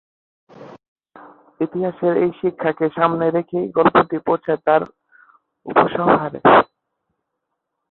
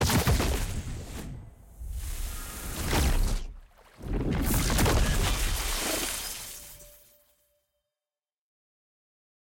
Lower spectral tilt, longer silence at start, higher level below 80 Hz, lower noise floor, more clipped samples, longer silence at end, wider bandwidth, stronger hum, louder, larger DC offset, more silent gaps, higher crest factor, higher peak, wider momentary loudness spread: first, -10 dB/octave vs -4 dB/octave; first, 0.6 s vs 0 s; second, -56 dBFS vs -32 dBFS; second, -77 dBFS vs under -90 dBFS; neither; second, 1.25 s vs 2.55 s; second, 4.2 kHz vs 17 kHz; neither; first, -18 LUFS vs -29 LUFS; neither; first, 0.88-0.96 s vs none; about the same, 18 dB vs 16 dB; first, -2 dBFS vs -14 dBFS; second, 9 LU vs 18 LU